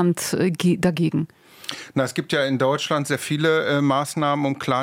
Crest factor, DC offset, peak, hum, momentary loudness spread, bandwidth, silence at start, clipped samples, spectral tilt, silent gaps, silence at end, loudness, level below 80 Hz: 14 dB; under 0.1%; -6 dBFS; none; 8 LU; 16.5 kHz; 0 s; under 0.1%; -5.5 dB/octave; none; 0 s; -22 LUFS; -62 dBFS